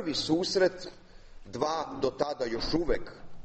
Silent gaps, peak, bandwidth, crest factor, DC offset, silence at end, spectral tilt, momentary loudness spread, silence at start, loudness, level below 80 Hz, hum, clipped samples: none; -12 dBFS; 8.4 kHz; 20 dB; under 0.1%; 0 s; -4.5 dB/octave; 17 LU; 0 s; -30 LUFS; -46 dBFS; none; under 0.1%